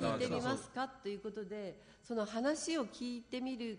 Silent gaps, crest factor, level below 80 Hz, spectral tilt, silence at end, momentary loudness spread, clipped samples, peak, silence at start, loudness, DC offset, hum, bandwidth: none; 16 dB; -70 dBFS; -4.5 dB/octave; 0 s; 9 LU; under 0.1%; -22 dBFS; 0 s; -40 LUFS; under 0.1%; none; 10 kHz